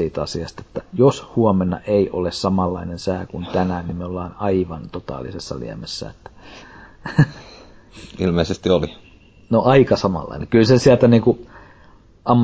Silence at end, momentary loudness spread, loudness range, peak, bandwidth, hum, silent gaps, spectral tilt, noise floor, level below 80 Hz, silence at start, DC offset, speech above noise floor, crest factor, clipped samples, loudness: 0 s; 16 LU; 10 LU; -2 dBFS; 8 kHz; none; none; -7 dB/octave; -48 dBFS; -40 dBFS; 0 s; under 0.1%; 29 dB; 18 dB; under 0.1%; -19 LUFS